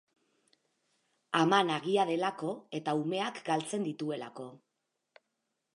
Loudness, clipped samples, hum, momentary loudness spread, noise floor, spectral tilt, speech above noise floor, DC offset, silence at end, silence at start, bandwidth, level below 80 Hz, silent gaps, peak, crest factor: -32 LUFS; under 0.1%; none; 13 LU; -84 dBFS; -5 dB/octave; 52 dB; under 0.1%; 1.2 s; 1.3 s; 11.5 kHz; -86 dBFS; none; -10 dBFS; 24 dB